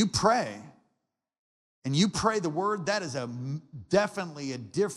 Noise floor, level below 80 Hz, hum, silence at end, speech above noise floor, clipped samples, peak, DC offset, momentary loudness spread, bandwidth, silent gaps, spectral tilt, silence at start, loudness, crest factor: -81 dBFS; -60 dBFS; none; 0 s; 53 dB; under 0.1%; -10 dBFS; under 0.1%; 12 LU; 12.5 kHz; 1.39-1.82 s; -4.5 dB/octave; 0 s; -29 LUFS; 20 dB